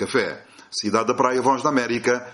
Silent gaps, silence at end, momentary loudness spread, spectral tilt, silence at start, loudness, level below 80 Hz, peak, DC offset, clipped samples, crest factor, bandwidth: none; 0 s; 10 LU; -4 dB/octave; 0 s; -22 LUFS; -64 dBFS; -2 dBFS; under 0.1%; under 0.1%; 18 dB; 11.5 kHz